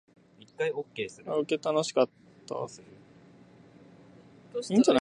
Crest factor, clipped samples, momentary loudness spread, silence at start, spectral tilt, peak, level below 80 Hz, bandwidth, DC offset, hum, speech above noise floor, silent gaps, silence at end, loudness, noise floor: 22 dB; under 0.1%; 14 LU; 0.6 s; -5 dB/octave; -10 dBFS; -72 dBFS; 11 kHz; under 0.1%; none; 27 dB; none; 0.05 s; -30 LUFS; -55 dBFS